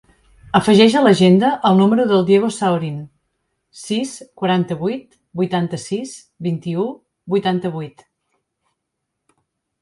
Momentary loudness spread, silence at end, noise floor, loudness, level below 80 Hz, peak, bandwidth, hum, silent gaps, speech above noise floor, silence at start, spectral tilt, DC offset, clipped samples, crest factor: 18 LU; 1.95 s; -77 dBFS; -17 LUFS; -58 dBFS; 0 dBFS; 11.5 kHz; none; none; 61 dB; 0.55 s; -6 dB/octave; under 0.1%; under 0.1%; 18 dB